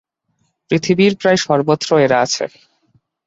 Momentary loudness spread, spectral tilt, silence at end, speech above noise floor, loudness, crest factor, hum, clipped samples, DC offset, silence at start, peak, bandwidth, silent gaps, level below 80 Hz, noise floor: 7 LU; -5 dB/octave; 0.8 s; 52 dB; -15 LUFS; 16 dB; none; under 0.1%; under 0.1%; 0.7 s; 0 dBFS; 8 kHz; none; -56 dBFS; -66 dBFS